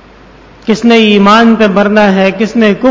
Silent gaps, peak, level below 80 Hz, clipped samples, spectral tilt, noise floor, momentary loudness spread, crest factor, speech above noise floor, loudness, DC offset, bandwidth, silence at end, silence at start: none; 0 dBFS; -42 dBFS; 2%; -6 dB/octave; -36 dBFS; 6 LU; 8 dB; 30 dB; -7 LUFS; under 0.1%; 7.8 kHz; 0 s; 0.65 s